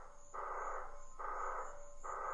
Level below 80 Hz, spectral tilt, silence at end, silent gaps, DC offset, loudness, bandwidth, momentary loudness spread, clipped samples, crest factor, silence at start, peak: -54 dBFS; -3.5 dB/octave; 0 s; none; under 0.1%; -46 LUFS; 8.2 kHz; 8 LU; under 0.1%; 14 dB; 0 s; -30 dBFS